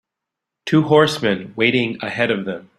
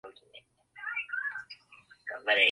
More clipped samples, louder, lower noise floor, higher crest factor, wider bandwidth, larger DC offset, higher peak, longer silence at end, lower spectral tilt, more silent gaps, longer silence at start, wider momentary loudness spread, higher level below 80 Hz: neither; first, -18 LUFS vs -32 LUFS; first, -83 dBFS vs -59 dBFS; second, 18 dB vs 24 dB; first, 13.5 kHz vs 11.5 kHz; neither; first, -2 dBFS vs -10 dBFS; first, 0.15 s vs 0 s; first, -6 dB/octave vs -1.5 dB/octave; neither; first, 0.65 s vs 0.05 s; second, 9 LU vs 23 LU; first, -58 dBFS vs -80 dBFS